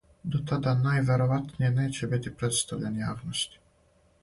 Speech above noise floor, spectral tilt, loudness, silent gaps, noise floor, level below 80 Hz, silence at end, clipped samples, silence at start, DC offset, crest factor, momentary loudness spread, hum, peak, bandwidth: 37 dB; -5 dB/octave; -28 LUFS; none; -64 dBFS; -56 dBFS; 0.75 s; under 0.1%; 0.25 s; under 0.1%; 14 dB; 7 LU; none; -14 dBFS; 11.5 kHz